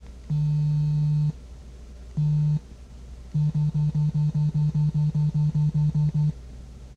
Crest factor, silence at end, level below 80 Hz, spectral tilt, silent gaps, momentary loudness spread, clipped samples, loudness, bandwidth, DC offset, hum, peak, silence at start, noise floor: 8 dB; 0.05 s; -42 dBFS; -10 dB/octave; none; 21 LU; under 0.1%; -25 LUFS; 4.8 kHz; under 0.1%; none; -16 dBFS; 0 s; -43 dBFS